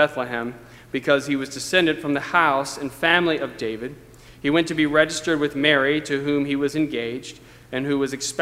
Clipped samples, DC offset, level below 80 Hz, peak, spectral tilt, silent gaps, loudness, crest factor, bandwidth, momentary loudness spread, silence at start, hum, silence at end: under 0.1%; under 0.1%; -54 dBFS; 0 dBFS; -4 dB/octave; none; -22 LUFS; 22 dB; 15.5 kHz; 11 LU; 0 s; none; 0 s